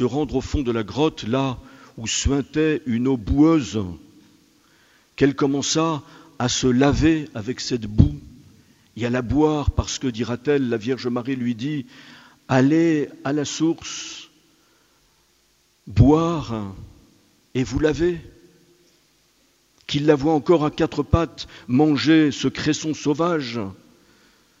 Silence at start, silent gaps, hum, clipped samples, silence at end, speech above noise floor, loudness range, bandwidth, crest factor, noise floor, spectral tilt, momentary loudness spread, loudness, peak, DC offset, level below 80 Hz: 0 s; none; none; under 0.1%; 0.85 s; 41 dB; 4 LU; 8 kHz; 22 dB; -62 dBFS; -5.5 dB/octave; 14 LU; -21 LUFS; 0 dBFS; under 0.1%; -36 dBFS